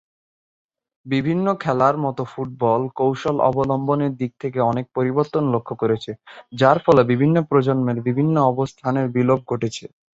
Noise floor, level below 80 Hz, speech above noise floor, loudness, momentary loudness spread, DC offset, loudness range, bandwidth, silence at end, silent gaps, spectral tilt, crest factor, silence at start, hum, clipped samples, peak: under -90 dBFS; -56 dBFS; over 71 dB; -20 LUFS; 9 LU; under 0.1%; 3 LU; 8 kHz; 0.3 s; none; -8 dB/octave; 18 dB; 1.05 s; none; under 0.1%; -2 dBFS